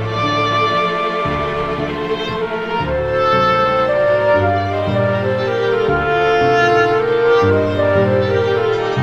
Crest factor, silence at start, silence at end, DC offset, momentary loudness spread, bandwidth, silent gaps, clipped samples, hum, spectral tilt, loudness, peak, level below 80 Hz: 12 dB; 0 s; 0 s; under 0.1%; 7 LU; 8 kHz; none; under 0.1%; none; -6.5 dB/octave; -15 LUFS; -2 dBFS; -40 dBFS